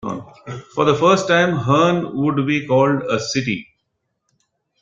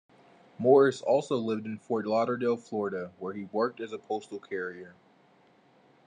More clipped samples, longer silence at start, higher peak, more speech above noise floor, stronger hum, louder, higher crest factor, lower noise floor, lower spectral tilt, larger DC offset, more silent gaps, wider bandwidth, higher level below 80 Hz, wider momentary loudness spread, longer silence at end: neither; second, 0.05 s vs 0.6 s; first, -2 dBFS vs -8 dBFS; first, 56 dB vs 34 dB; neither; first, -17 LUFS vs -29 LUFS; second, 16 dB vs 22 dB; first, -73 dBFS vs -62 dBFS; about the same, -5.5 dB/octave vs -6.5 dB/octave; neither; neither; second, 7.8 kHz vs 9.6 kHz; first, -54 dBFS vs -84 dBFS; about the same, 14 LU vs 16 LU; about the same, 1.2 s vs 1.15 s